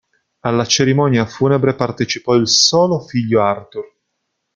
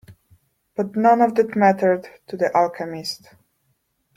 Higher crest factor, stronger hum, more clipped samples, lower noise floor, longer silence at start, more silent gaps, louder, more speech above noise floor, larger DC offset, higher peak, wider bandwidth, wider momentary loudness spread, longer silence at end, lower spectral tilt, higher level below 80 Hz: about the same, 16 dB vs 18 dB; neither; neither; first, -73 dBFS vs -69 dBFS; first, 0.45 s vs 0.1 s; neither; first, -15 LUFS vs -20 LUFS; first, 58 dB vs 50 dB; neither; about the same, 0 dBFS vs -2 dBFS; second, 9.2 kHz vs 15.5 kHz; second, 11 LU vs 15 LU; second, 0.7 s vs 1 s; second, -4 dB/octave vs -6 dB/octave; first, -52 dBFS vs -66 dBFS